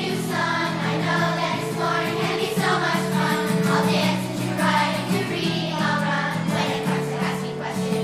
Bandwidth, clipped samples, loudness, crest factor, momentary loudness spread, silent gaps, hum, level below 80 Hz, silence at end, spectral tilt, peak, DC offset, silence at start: 15.5 kHz; under 0.1%; -22 LUFS; 14 dB; 5 LU; none; none; -58 dBFS; 0 s; -5 dB/octave; -8 dBFS; under 0.1%; 0 s